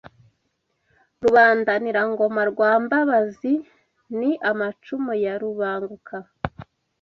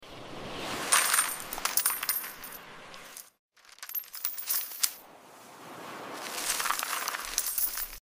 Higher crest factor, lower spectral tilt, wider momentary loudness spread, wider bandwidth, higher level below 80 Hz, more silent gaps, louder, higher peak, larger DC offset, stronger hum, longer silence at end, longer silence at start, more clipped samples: second, 18 dB vs 28 dB; first, -7 dB/octave vs 0.5 dB/octave; second, 17 LU vs 21 LU; second, 7.2 kHz vs 16 kHz; about the same, -56 dBFS vs -60 dBFS; second, none vs 3.39-3.49 s; first, -21 LUFS vs -29 LUFS; about the same, -4 dBFS vs -6 dBFS; neither; neither; first, 0.4 s vs 0.05 s; first, 1.2 s vs 0 s; neither